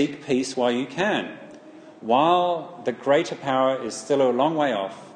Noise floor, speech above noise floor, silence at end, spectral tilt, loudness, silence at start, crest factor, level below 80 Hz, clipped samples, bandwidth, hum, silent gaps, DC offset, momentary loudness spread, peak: -45 dBFS; 22 dB; 0 s; -4.5 dB/octave; -23 LUFS; 0 s; 18 dB; -72 dBFS; under 0.1%; 9.8 kHz; none; none; under 0.1%; 9 LU; -6 dBFS